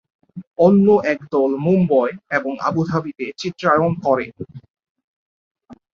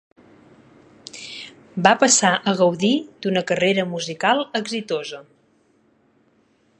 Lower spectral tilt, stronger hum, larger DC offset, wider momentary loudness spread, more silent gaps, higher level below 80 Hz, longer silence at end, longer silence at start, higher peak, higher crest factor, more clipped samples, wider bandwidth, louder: first, -8 dB/octave vs -3 dB/octave; neither; neither; second, 17 LU vs 20 LU; first, 0.47-0.51 s, 4.70-4.74 s, 4.90-4.95 s, 5.04-5.55 s vs none; first, -56 dBFS vs -68 dBFS; second, 0.2 s vs 1.55 s; second, 0.35 s vs 1.15 s; about the same, -2 dBFS vs 0 dBFS; second, 16 dB vs 22 dB; neither; second, 7.2 kHz vs 11.5 kHz; about the same, -18 LUFS vs -19 LUFS